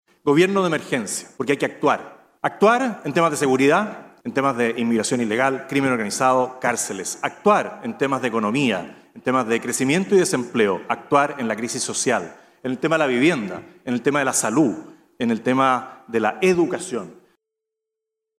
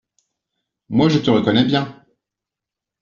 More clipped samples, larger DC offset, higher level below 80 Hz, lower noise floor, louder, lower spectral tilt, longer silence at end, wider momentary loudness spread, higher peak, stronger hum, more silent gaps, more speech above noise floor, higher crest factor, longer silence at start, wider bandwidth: neither; neither; second, -66 dBFS vs -54 dBFS; about the same, -83 dBFS vs -86 dBFS; second, -21 LUFS vs -17 LUFS; about the same, -4.5 dB/octave vs -5 dB/octave; first, 1.25 s vs 1.1 s; first, 10 LU vs 7 LU; about the same, -4 dBFS vs -2 dBFS; neither; neither; second, 63 dB vs 70 dB; about the same, 18 dB vs 18 dB; second, 0.25 s vs 0.9 s; first, 16 kHz vs 7.4 kHz